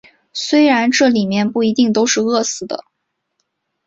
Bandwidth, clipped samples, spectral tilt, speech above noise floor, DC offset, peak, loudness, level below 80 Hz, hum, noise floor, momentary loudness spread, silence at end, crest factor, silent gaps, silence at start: 8 kHz; under 0.1%; -3.5 dB/octave; 59 dB; under 0.1%; -2 dBFS; -15 LUFS; -60 dBFS; none; -74 dBFS; 13 LU; 1.1 s; 14 dB; none; 0.35 s